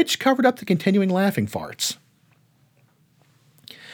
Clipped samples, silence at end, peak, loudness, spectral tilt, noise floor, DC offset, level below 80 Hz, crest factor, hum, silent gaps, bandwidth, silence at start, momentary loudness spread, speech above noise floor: under 0.1%; 0 s; -4 dBFS; -21 LUFS; -4.5 dB/octave; -61 dBFS; under 0.1%; -68 dBFS; 20 dB; none; none; over 20 kHz; 0 s; 10 LU; 40 dB